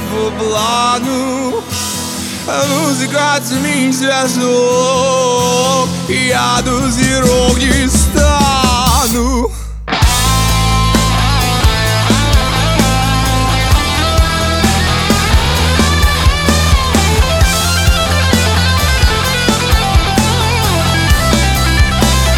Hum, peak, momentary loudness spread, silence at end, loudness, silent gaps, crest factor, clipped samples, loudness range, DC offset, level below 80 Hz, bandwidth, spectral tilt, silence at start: none; 0 dBFS; 4 LU; 0 s; -12 LUFS; none; 12 dB; under 0.1%; 2 LU; under 0.1%; -18 dBFS; 19.5 kHz; -4 dB/octave; 0 s